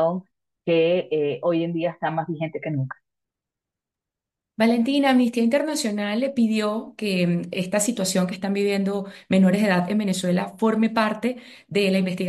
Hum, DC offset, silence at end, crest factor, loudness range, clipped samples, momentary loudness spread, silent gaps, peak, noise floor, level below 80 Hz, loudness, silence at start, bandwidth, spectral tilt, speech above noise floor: none; under 0.1%; 0 s; 16 dB; 5 LU; under 0.1%; 9 LU; none; -6 dBFS; -87 dBFS; -70 dBFS; -23 LUFS; 0 s; 12.5 kHz; -5.5 dB/octave; 65 dB